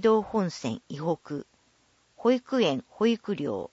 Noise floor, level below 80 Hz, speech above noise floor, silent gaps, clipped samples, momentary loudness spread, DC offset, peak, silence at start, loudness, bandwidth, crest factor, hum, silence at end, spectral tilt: -66 dBFS; -66 dBFS; 39 dB; none; under 0.1%; 10 LU; under 0.1%; -12 dBFS; 0 s; -28 LUFS; 8 kHz; 16 dB; none; 0.05 s; -6 dB/octave